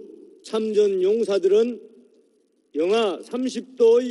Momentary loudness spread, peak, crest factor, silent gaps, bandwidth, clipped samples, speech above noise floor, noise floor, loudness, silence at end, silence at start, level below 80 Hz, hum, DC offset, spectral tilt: 11 LU; -8 dBFS; 14 dB; none; 11.5 kHz; under 0.1%; 44 dB; -64 dBFS; -22 LUFS; 0 s; 0 s; -72 dBFS; none; under 0.1%; -5 dB/octave